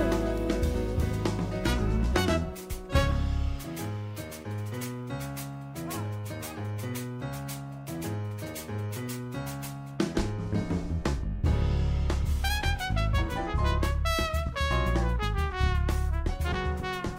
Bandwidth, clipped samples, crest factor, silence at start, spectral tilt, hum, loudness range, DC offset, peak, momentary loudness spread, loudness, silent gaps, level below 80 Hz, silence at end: 16 kHz; under 0.1%; 18 dB; 0 s; -6 dB/octave; none; 7 LU; under 0.1%; -12 dBFS; 9 LU; -31 LUFS; none; -32 dBFS; 0 s